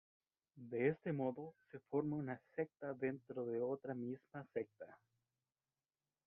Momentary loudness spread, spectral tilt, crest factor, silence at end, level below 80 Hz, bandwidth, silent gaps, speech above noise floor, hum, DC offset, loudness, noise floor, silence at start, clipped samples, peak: 14 LU; -8.5 dB/octave; 20 dB; 1.3 s; -84 dBFS; 3.7 kHz; none; over 46 dB; none; under 0.1%; -44 LUFS; under -90 dBFS; 0.55 s; under 0.1%; -24 dBFS